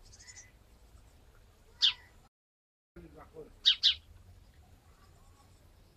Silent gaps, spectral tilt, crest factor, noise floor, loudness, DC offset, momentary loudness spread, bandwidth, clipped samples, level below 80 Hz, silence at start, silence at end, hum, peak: 2.28-2.95 s; 0 dB/octave; 26 dB; -60 dBFS; -27 LUFS; under 0.1%; 28 LU; 15.5 kHz; under 0.1%; -62 dBFS; 0.35 s; 2 s; none; -12 dBFS